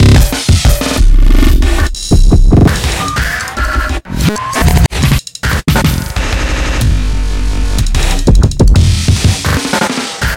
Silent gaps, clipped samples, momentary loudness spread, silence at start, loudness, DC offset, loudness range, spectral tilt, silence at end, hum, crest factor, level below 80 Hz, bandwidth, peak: none; under 0.1%; 7 LU; 0 s; -12 LUFS; under 0.1%; 3 LU; -5 dB/octave; 0 s; none; 8 dB; -12 dBFS; 17 kHz; 0 dBFS